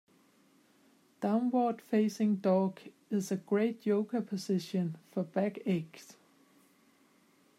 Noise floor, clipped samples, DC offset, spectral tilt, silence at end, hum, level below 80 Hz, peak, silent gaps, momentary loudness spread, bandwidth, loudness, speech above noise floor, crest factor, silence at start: -67 dBFS; under 0.1%; under 0.1%; -7 dB/octave; 1.45 s; none; -86 dBFS; -16 dBFS; none; 8 LU; 14 kHz; -33 LUFS; 35 dB; 16 dB; 1.2 s